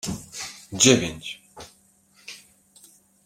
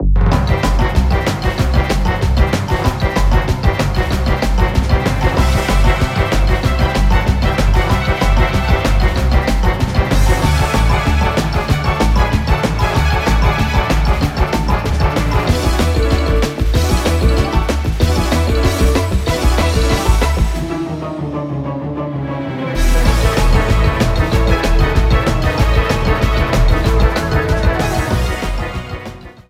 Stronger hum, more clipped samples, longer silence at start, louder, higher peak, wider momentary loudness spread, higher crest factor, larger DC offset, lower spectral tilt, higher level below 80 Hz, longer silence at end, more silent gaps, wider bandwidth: neither; neither; about the same, 0.05 s vs 0 s; second, -21 LUFS vs -15 LUFS; about the same, -2 dBFS vs 0 dBFS; first, 28 LU vs 4 LU; first, 26 dB vs 14 dB; neither; second, -3 dB/octave vs -6 dB/octave; second, -56 dBFS vs -16 dBFS; first, 0.9 s vs 0.1 s; neither; about the same, 16 kHz vs 15.5 kHz